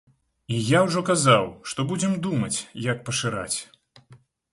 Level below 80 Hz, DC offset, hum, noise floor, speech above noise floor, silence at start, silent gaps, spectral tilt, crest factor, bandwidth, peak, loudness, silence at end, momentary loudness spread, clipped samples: -58 dBFS; under 0.1%; none; -54 dBFS; 31 dB; 0.5 s; none; -4.5 dB/octave; 20 dB; 11.5 kHz; -4 dBFS; -24 LUFS; 0.35 s; 11 LU; under 0.1%